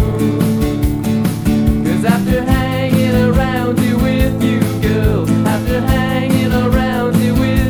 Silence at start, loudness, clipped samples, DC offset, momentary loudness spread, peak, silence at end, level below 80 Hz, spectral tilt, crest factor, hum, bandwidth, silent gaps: 0 s; -14 LUFS; under 0.1%; 0.4%; 2 LU; 0 dBFS; 0 s; -24 dBFS; -7 dB/octave; 14 dB; none; 19 kHz; none